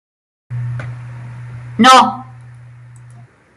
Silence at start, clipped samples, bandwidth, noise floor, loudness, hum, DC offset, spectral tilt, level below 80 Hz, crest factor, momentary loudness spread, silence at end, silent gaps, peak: 0.5 s; under 0.1%; 15.5 kHz; -41 dBFS; -11 LUFS; none; under 0.1%; -4 dB/octave; -54 dBFS; 16 dB; 24 LU; 1.35 s; none; 0 dBFS